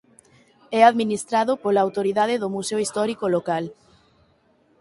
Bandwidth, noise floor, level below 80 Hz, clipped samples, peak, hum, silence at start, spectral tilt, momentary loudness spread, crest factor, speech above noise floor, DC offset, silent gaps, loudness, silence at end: 11.5 kHz; -61 dBFS; -68 dBFS; under 0.1%; -2 dBFS; none; 0.7 s; -4.5 dB/octave; 10 LU; 20 dB; 40 dB; under 0.1%; none; -21 LUFS; 1.05 s